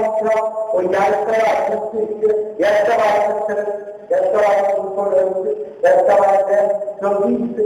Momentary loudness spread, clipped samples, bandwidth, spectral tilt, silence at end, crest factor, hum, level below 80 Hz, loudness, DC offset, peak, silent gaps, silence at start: 7 LU; under 0.1%; 11 kHz; -5.5 dB/octave; 0 s; 12 dB; none; -60 dBFS; -17 LUFS; under 0.1%; -4 dBFS; none; 0 s